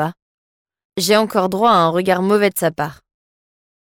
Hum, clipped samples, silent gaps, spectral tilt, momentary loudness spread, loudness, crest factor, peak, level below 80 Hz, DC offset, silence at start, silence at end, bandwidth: none; under 0.1%; 0.22-0.65 s, 0.85-0.90 s; -4.5 dB/octave; 12 LU; -16 LUFS; 16 dB; -2 dBFS; -58 dBFS; under 0.1%; 0 s; 0.95 s; 17 kHz